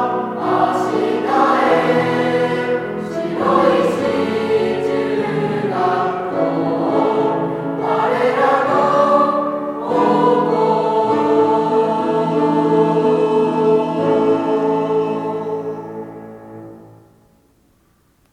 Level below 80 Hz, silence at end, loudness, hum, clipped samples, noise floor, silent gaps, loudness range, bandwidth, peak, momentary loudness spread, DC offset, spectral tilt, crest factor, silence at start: -58 dBFS; 1.5 s; -17 LUFS; none; under 0.1%; -57 dBFS; none; 4 LU; 11.5 kHz; -2 dBFS; 9 LU; under 0.1%; -7 dB/octave; 16 dB; 0 s